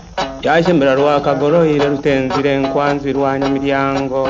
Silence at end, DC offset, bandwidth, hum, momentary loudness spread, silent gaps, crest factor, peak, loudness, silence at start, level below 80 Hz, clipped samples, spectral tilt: 0 s; under 0.1%; 7.6 kHz; none; 4 LU; none; 14 dB; 0 dBFS; -15 LUFS; 0 s; -40 dBFS; under 0.1%; -6.5 dB/octave